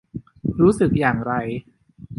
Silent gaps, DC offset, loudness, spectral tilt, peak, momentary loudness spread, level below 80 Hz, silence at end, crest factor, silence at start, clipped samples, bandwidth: none; under 0.1%; -20 LUFS; -8 dB/octave; -2 dBFS; 15 LU; -44 dBFS; 0.05 s; 18 dB; 0.15 s; under 0.1%; 11.5 kHz